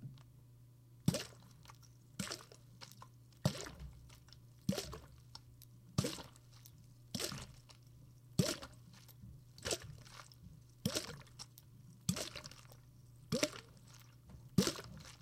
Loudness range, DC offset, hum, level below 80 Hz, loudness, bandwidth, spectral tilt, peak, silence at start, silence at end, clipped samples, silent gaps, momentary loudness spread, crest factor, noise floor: 3 LU; under 0.1%; none; -64 dBFS; -42 LUFS; 16.5 kHz; -4 dB/octave; -12 dBFS; 0 s; 0.05 s; under 0.1%; none; 22 LU; 32 dB; -62 dBFS